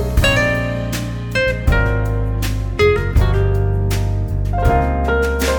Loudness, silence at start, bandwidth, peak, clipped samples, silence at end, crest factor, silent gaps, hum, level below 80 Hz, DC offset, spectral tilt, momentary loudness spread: -17 LUFS; 0 s; 19.5 kHz; -2 dBFS; under 0.1%; 0 s; 14 dB; none; none; -20 dBFS; under 0.1%; -6 dB/octave; 6 LU